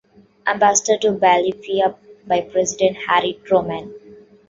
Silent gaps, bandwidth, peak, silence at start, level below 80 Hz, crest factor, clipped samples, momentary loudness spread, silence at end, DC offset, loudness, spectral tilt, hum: none; 8 kHz; -2 dBFS; 0.45 s; -58 dBFS; 18 dB; under 0.1%; 9 LU; 0.35 s; under 0.1%; -18 LUFS; -2.5 dB/octave; none